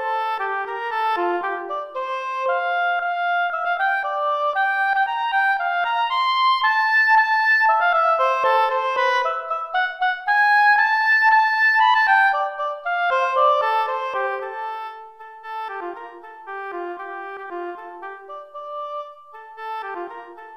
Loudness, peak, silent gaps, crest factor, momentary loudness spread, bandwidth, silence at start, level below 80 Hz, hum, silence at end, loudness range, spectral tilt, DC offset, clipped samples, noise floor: -19 LUFS; -6 dBFS; none; 16 dB; 18 LU; 14 kHz; 0 s; -72 dBFS; none; 0 s; 16 LU; -1 dB/octave; under 0.1%; under 0.1%; -41 dBFS